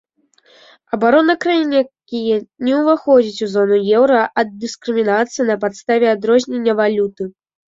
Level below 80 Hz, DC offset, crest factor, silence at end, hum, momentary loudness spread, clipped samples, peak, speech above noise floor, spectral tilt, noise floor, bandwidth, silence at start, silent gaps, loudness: -62 dBFS; under 0.1%; 14 dB; 0.4 s; none; 9 LU; under 0.1%; -2 dBFS; 40 dB; -5 dB/octave; -55 dBFS; 7.8 kHz; 0.95 s; none; -16 LUFS